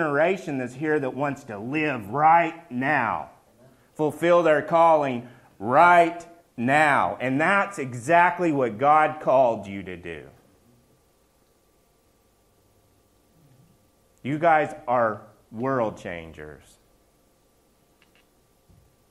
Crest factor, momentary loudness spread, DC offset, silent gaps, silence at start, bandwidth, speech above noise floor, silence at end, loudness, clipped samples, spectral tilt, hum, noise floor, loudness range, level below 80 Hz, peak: 22 dB; 18 LU; under 0.1%; none; 0 s; 13 kHz; 41 dB; 2.55 s; -22 LUFS; under 0.1%; -6 dB/octave; none; -63 dBFS; 12 LU; -64 dBFS; -4 dBFS